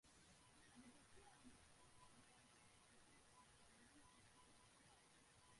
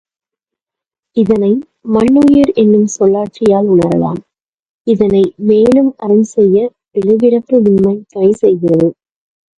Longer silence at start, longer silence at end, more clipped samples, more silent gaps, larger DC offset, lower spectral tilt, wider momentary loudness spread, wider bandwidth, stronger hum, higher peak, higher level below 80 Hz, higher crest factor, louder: second, 0.05 s vs 1.15 s; second, 0 s vs 0.65 s; neither; second, none vs 4.42-4.85 s; neither; second, -3 dB/octave vs -7.5 dB/octave; second, 2 LU vs 8 LU; about the same, 11.5 kHz vs 11 kHz; neither; second, -52 dBFS vs 0 dBFS; second, -82 dBFS vs -46 dBFS; first, 18 dB vs 12 dB; second, -69 LUFS vs -11 LUFS